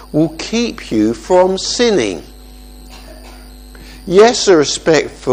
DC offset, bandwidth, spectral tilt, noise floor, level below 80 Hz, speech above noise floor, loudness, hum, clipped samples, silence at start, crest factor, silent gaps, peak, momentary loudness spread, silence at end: under 0.1%; 15 kHz; -4 dB/octave; -35 dBFS; -38 dBFS; 23 dB; -13 LUFS; none; 0.1%; 0 s; 14 dB; none; 0 dBFS; 9 LU; 0 s